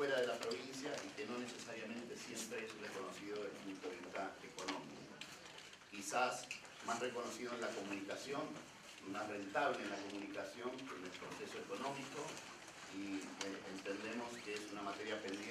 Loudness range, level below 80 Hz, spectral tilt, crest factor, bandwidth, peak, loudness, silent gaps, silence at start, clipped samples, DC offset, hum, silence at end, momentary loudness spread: 4 LU; -82 dBFS; -3 dB/octave; 22 dB; 15 kHz; -24 dBFS; -46 LUFS; none; 0 s; under 0.1%; under 0.1%; none; 0 s; 11 LU